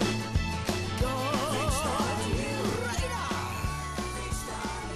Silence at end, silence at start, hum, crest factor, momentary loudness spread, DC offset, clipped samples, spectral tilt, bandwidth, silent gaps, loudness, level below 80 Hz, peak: 0 s; 0 s; none; 14 dB; 6 LU; under 0.1%; under 0.1%; -4.5 dB/octave; 13.5 kHz; none; -31 LUFS; -40 dBFS; -16 dBFS